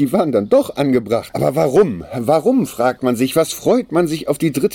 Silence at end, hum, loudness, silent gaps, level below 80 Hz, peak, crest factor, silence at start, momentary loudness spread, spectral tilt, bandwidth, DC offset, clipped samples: 0 s; none; -16 LUFS; none; -50 dBFS; -2 dBFS; 14 dB; 0 s; 4 LU; -6 dB/octave; 17.5 kHz; under 0.1%; under 0.1%